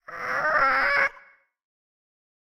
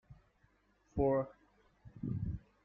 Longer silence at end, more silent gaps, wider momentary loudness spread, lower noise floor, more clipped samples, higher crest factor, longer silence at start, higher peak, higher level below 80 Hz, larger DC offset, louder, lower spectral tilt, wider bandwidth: first, 1.3 s vs 0.25 s; neither; second, 6 LU vs 13 LU; second, -54 dBFS vs -73 dBFS; neither; about the same, 18 dB vs 20 dB; about the same, 0.1 s vs 0.1 s; first, -10 dBFS vs -20 dBFS; about the same, -56 dBFS vs -54 dBFS; neither; first, -22 LUFS vs -38 LUFS; second, -3 dB/octave vs -11 dB/octave; first, 16.5 kHz vs 6.8 kHz